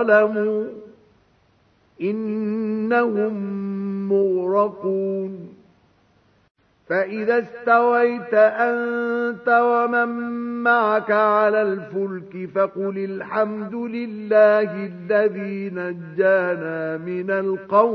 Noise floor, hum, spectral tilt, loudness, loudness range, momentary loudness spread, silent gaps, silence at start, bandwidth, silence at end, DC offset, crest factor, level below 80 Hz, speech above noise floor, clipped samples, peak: -60 dBFS; none; -9 dB/octave; -21 LUFS; 6 LU; 11 LU; 6.51-6.55 s; 0 s; 5.8 kHz; 0 s; under 0.1%; 18 dB; -70 dBFS; 39 dB; under 0.1%; -2 dBFS